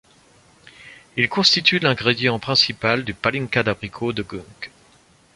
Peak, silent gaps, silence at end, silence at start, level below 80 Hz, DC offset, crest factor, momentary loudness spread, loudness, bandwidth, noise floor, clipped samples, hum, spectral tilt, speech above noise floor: 0 dBFS; none; 0.7 s; 0.8 s; -54 dBFS; under 0.1%; 22 dB; 18 LU; -19 LUFS; 11.5 kHz; -54 dBFS; under 0.1%; none; -4 dB/octave; 34 dB